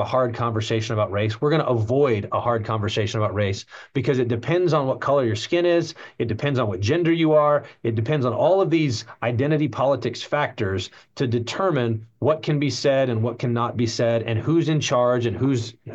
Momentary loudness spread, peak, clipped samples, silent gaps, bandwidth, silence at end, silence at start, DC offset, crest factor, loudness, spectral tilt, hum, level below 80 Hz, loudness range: 7 LU; -8 dBFS; under 0.1%; none; 8.2 kHz; 0 s; 0 s; under 0.1%; 14 dB; -22 LUFS; -6.5 dB/octave; none; -62 dBFS; 3 LU